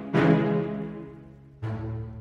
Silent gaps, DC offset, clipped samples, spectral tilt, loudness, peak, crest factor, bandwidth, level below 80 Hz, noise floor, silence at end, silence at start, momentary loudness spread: none; under 0.1%; under 0.1%; -9 dB/octave; -27 LUFS; -10 dBFS; 18 dB; 7 kHz; -52 dBFS; -47 dBFS; 0 s; 0 s; 20 LU